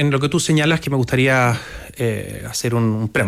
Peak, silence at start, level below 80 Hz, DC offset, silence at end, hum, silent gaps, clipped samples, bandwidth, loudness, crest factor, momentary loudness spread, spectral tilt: -6 dBFS; 0 s; -44 dBFS; under 0.1%; 0 s; none; none; under 0.1%; 15.5 kHz; -18 LUFS; 12 dB; 10 LU; -5 dB/octave